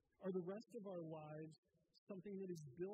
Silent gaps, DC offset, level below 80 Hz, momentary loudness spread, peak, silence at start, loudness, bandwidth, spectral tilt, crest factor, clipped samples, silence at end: 1.58-1.63 s, 1.98-2.07 s; under 0.1%; under -90 dBFS; 9 LU; -36 dBFS; 0.2 s; -52 LUFS; 8.4 kHz; -8 dB/octave; 16 dB; under 0.1%; 0 s